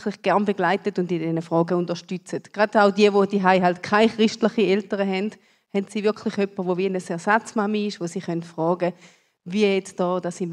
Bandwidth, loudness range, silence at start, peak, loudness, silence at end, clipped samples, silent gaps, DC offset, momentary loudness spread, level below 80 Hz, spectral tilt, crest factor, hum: 11 kHz; 5 LU; 0 s; -2 dBFS; -22 LUFS; 0 s; under 0.1%; none; under 0.1%; 11 LU; -72 dBFS; -6 dB/octave; 20 dB; none